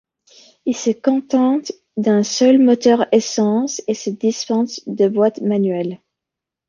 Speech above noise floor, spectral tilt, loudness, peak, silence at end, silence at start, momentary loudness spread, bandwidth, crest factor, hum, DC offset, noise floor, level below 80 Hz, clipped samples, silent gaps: 68 dB; -5 dB/octave; -17 LUFS; -2 dBFS; 0.7 s; 0.65 s; 11 LU; 7.6 kHz; 16 dB; none; under 0.1%; -84 dBFS; -66 dBFS; under 0.1%; none